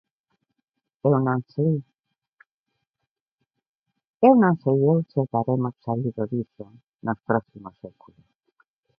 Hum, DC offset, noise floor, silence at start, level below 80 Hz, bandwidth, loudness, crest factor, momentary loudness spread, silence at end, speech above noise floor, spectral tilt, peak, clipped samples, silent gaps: none; under 0.1%; -84 dBFS; 1.05 s; -64 dBFS; 5.2 kHz; -23 LUFS; 22 dB; 14 LU; 1.1 s; 61 dB; -13 dB/octave; -4 dBFS; under 0.1%; 2.33-2.37 s, 2.51-2.64 s, 3.11-3.15 s, 3.21-3.38 s, 3.68-3.80 s, 4.07-4.14 s, 6.89-6.93 s